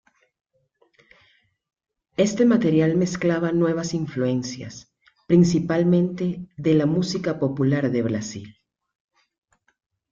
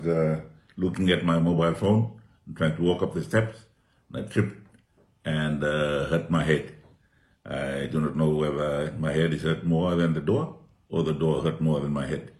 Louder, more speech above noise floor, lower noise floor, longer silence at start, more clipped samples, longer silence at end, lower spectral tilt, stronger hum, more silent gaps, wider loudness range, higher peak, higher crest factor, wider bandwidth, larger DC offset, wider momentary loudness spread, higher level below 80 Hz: first, -22 LUFS vs -26 LUFS; first, 45 dB vs 38 dB; about the same, -66 dBFS vs -64 dBFS; first, 2.2 s vs 0 s; neither; first, 1.6 s vs 0.1 s; about the same, -7 dB/octave vs -7.5 dB/octave; neither; neither; about the same, 3 LU vs 3 LU; about the same, -6 dBFS vs -8 dBFS; about the same, 18 dB vs 18 dB; second, 7.6 kHz vs 11.5 kHz; neither; first, 13 LU vs 9 LU; second, -58 dBFS vs -50 dBFS